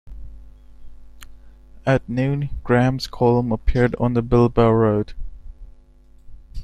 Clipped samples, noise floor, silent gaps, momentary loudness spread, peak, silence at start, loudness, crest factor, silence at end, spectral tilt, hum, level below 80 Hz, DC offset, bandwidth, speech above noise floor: under 0.1%; -48 dBFS; none; 13 LU; -2 dBFS; 0.05 s; -19 LUFS; 18 dB; 0 s; -8 dB/octave; none; -34 dBFS; under 0.1%; 10.5 kHz; 30 dB